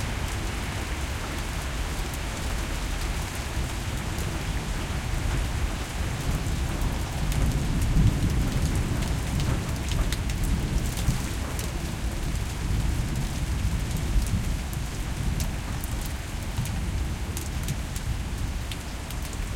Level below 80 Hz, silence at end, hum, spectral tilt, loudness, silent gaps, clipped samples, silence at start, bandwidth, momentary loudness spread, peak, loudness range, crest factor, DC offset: -30 dBFS; 0 s; none; -5 dB/octave; -29 LUFS; none; under 0.1%; 0 s; 17 kHz; 5 LU; -10 dBFS; 4 LU; 18 dB; under 0.1%